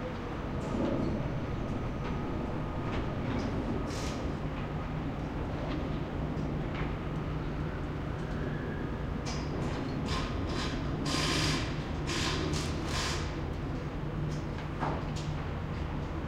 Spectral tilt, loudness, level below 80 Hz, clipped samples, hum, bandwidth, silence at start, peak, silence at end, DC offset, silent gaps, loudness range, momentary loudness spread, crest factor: -5.5 dB/octave; -35 LUFS; -42 dBFS; under 0.1%; none; 15 kHz; 0 s; -16 dBFS; 0 s; under 0.1%; none; 4 LU; 5 LU; 18 dB